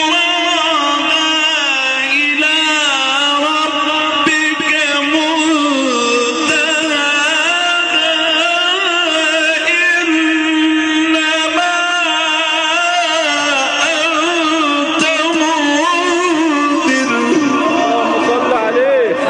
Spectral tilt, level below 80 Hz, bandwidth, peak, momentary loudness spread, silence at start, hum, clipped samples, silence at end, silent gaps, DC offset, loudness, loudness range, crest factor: -1 dB/octave; -58 dBFS; 10 kHz; -2 dBFS; 2 LU; 0 s; none; under 0.1%; 0 s; none; under 0.1%; -12 LUFS; 1 LU; 10 dB